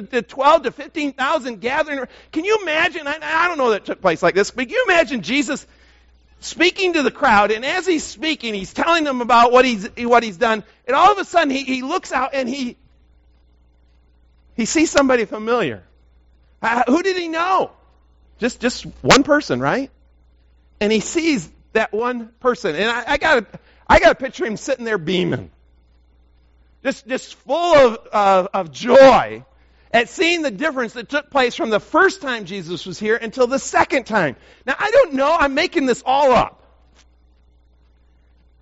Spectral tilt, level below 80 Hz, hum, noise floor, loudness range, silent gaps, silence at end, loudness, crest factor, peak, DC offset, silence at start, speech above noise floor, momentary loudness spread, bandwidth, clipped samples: -2 dB/octave; -46 dBFS; none; -54 dBFS; 6 LU; none; 2.15 s; -18 LUFS; 18 dB; 0 dBFS; under 0.1%; 0 s; 36 dB; 11 LU; 8 kHz; under 0.1%